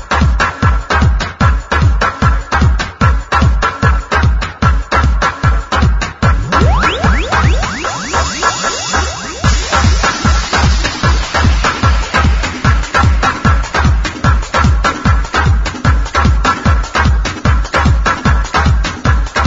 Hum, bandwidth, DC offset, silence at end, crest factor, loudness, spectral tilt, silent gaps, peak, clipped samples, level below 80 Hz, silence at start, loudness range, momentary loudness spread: none; 7.8 kHz; under 0.1%; 0 s; 12 dB; -13 LUFS; -5 dB/octave; none; 0 dBFS; under 0.1%; -16 dBFS; 0 s; 1 LU; 3 LU